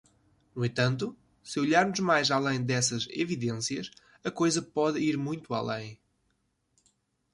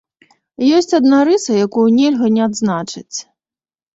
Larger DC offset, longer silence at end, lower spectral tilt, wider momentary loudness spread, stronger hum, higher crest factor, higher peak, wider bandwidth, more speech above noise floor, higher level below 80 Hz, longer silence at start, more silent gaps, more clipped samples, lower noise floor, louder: neither; first, 1.4 s vs 0.7 s; about the same, -4.5 dB/octave vs -5 dB/octave; about the same, 13 LU vs 13 LU; neither; first, 20 dB vs 12 dB; second, -12 dBFS vs -2 dBFS; first, 11.5 kHz vs 8 kHz; second, 46 dB vs over 77 dB; second, -66 dBFS vs -60 dBFS; about the same, 0.55 s vs 0.6 s; neither; neither; second, -75 dBFS vs under -90 dBFS; second, -29 LUFS vs -14 LUFS